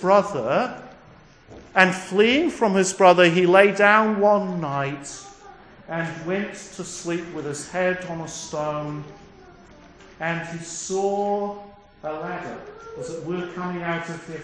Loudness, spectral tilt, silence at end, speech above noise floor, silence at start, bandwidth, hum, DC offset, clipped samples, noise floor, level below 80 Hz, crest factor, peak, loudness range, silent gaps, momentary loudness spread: -22 LUFS; -4.5 dB/octave; 0 s; 28 dB; 0 s; 10.5 kHz; none; under 0.1%; under 0.1%; -49 dBFS; -58 dBFS; 22 dB; 0 dBFS; 12 LU; none; 18 LU